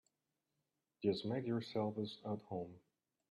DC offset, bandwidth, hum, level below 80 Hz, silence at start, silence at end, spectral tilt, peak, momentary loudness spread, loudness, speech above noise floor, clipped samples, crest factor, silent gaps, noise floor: under 0.1%; 11.5 kHz; none; -82 dBFS; 1 s; 0.5 s; -7.5 dB/octave; -24 dBFS; 8 LU; -42 LUFS; 48 dB; under 0.1%; 20 dB; none; -89 dBFS